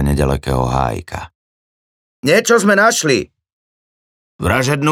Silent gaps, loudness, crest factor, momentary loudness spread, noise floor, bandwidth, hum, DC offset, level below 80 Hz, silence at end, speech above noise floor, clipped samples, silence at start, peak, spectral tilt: 1.35-2.23 s, 3.53-4.39 s; -15 LUFS; 16 dB; 15 LU; under -90 dBFS; 17 kHz; none; under 0.1%; -32 dBFS; 0 s; over 76 dB; under 0.1%; 0 s; 0 dBFS; -4.5 dB/octave